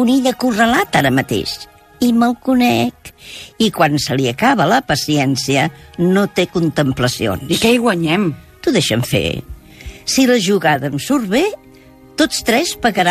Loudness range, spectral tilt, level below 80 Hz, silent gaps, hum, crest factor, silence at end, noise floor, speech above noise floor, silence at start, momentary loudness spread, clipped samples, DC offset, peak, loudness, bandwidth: 1 LU; -4.5 dB/octave; -42 dBFS; none; none; 16 dB; 0 s; -42 dBFS; 27 dB; 0 s; 9 LU; under 0.1%; under 0.1%; 0 dBFS; -15 LUFS; 15 kHz